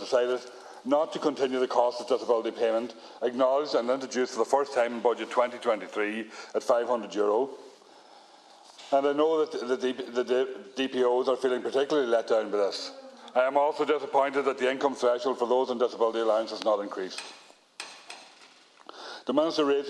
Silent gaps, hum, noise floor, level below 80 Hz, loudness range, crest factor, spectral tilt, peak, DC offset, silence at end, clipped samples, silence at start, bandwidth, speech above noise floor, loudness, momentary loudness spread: none; none; -55 dBFS; -82 dBFS; 4 LU; 20 dB; -3.5 dB/octave; -8 dBFS; under 0.1%; 0 s; under 0.1%; 0 s; 11.5 kHz; 28 dB; -28 LUFS; 13 LU